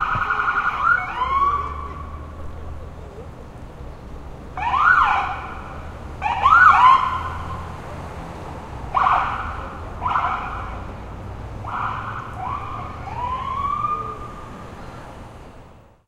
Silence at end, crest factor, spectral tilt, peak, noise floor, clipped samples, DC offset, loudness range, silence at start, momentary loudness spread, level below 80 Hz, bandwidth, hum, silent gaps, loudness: 0.25 s; 22 dB; -5 dB/octave; 0 dBFS; -45 dBFS; under 0.1%; under 0.1%; 12 LU; 0 s; 23 LU; -38 dBFS; 12 kHz; none; none; -20 LUFS